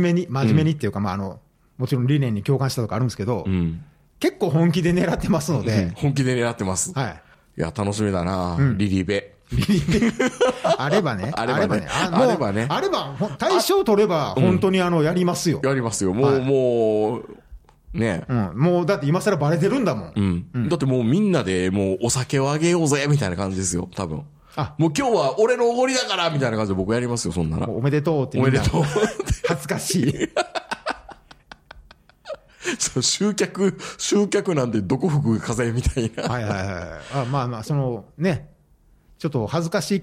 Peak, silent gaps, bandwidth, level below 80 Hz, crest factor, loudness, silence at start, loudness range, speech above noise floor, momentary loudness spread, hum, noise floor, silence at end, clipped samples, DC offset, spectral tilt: -4 dBFS; none; 15.5 kHz; -42 dBFS; 16 dB; -22 LUFS; 0 s; 5 LU; 35 dB; 9 LU; none; -56 dBFS; 0 s; under 0.1%; under 0.1%; -5.5 dB/octave